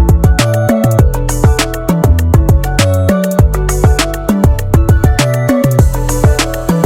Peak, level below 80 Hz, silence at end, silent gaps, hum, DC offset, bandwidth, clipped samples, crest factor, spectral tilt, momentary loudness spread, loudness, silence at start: 0 dBFS; -14 dBFS; 0 s; none; none; under 0.1%; 17.5 kHz; 0.2%; 10 dB; -6 dB/octave; 3 LU; -11 LUFS; 0 s